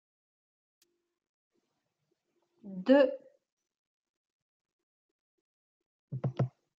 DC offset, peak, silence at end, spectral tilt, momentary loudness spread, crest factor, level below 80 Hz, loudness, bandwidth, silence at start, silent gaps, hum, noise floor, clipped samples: under 0.1%; -12 dBFS; 0.3 s; -6.5 dB/octave; 21 LU; 24 dB; -82 dBFS; -29 LUFS; 7.4 kHz; 2.65 s; 3.52-3.57 s, 3.77-4.65 s, 4.72-5.80 s, 5.86-6.08 s; none; -83 dBFS; under 0.1%